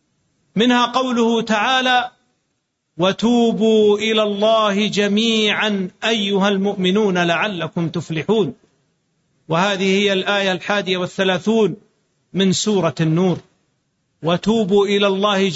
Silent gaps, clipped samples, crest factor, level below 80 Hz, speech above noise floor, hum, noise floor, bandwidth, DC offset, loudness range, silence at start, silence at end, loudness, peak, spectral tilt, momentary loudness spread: none; under 0.1%; 14 dB; -58 dBFS; 55 dB; none; -71 dBFS; 8 kHz; under 0.1%; 4 LU; 0.55 s; 0 s; -17 LUFS; -4 dBFS; -5 dB/octave; 7 LU